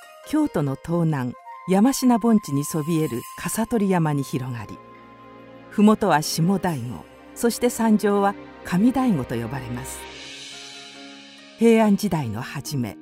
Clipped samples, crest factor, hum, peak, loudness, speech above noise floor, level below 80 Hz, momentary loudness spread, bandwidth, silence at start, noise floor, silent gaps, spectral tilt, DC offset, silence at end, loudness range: under 0.1%; 18 dB; none; -4 dBFS; -22 LUFS; 24 dB; -52 dBFS; 19 LU; 16 kHz; 0 s; -45 dBFS; none; -6 dB/octave; under 0.1%; 0 s; 4 LU